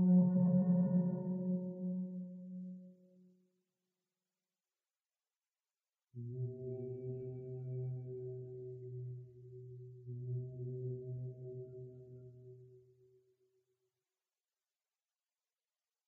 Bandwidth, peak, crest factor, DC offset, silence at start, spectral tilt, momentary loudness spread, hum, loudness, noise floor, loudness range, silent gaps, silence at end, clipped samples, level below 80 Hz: 1.9 kHz; -20 dBFS; 20 dB; under 0.1%; 0 s; -14 dB/octave; 23 LU; none; -39 LUFS; under -90 dBFS; 18 LU; none; 3.25 s; under 0.1%; -80 dBFS